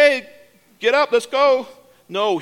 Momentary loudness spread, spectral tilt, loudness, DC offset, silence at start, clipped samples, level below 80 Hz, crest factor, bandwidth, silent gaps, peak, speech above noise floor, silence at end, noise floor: 10 LU; -3 dB/octave; -18 LUFS; under 0.1%; 0 s; under 0.1%; -70 dBFS; 18 dB; 15 kHz; none; -2 dBFS; 32 dB; 0 s; -50 dBFS